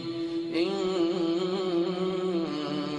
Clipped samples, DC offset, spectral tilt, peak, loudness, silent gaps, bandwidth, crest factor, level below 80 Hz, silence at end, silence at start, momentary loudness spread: under 0.1%; under 0.1%; -6.5 dB/octave; -16 dBFS; -29 LUFS; none; 9.6 kHz; 14 dB; -66 dBFS; 0 s; 0 s; 4 LU